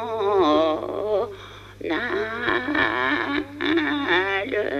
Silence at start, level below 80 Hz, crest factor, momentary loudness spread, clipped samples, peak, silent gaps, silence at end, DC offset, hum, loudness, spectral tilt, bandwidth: 0 s; -52 dBFS; 18 dB; 8 LU; under 0.1%; -6 dBFS; none; 0 s; under 0.1%; 50 Hz at -45 dBFS; -23 LUFS; -5.5 dB/octave; 13.5 kHz